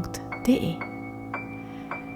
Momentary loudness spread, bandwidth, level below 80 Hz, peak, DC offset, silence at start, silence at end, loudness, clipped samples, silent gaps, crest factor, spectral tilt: 13 LU; 18.5 kHz; -52 dBFS; -10 dBFS; under 0.1%; 0 s; 0 s; -30 LUFS; under 0.1%; none; 20 dB; -6 dB/octave